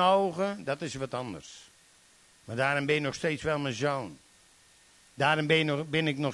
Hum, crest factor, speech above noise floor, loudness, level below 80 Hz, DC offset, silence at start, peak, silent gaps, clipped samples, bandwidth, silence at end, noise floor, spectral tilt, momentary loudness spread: none; 20 dB; 31 dB; -29 LUFS; -64 dBFS; under 0.1%; 0 s; -10 dBFS; none; under 0.1%; 12 kHz; 0 s; -60 dBFS; -5 dB/octave; 15 LU